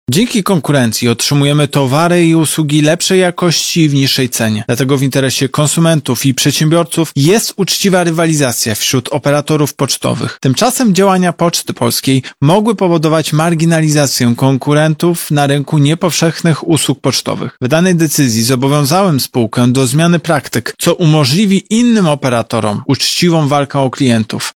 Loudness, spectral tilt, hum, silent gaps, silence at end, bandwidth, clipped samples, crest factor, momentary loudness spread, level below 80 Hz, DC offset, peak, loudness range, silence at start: -11 LUFS; -5 dB/octave; none; none; 0.05 s; 18.5 kHz; under 0.1%; 12 dB; 4 LU; -50 dBFS; under 0.1%; 0 dBFS; 1 LU; 0.1 s